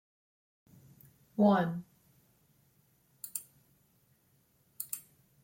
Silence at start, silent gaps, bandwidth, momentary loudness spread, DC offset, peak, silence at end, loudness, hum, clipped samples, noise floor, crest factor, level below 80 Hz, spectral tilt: 1.4 s; none; 16.5 kHz; 17 LU; under 0.1%; -14 dBFS; 0.45 s; -33 LUFS; none; under 0.1%; -71 dBFS; 24 dB; -78 dBFS; -6 dB/octave